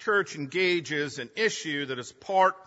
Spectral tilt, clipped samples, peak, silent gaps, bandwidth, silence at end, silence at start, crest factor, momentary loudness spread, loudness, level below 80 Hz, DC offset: -3.5 dB/octave; under 0.1%; -10 dBFS; none; 8 kHz; 0.05 s; 0 s; 18 dB; 9 LU; -28 LUFS; -74 dBFS; under 0.1%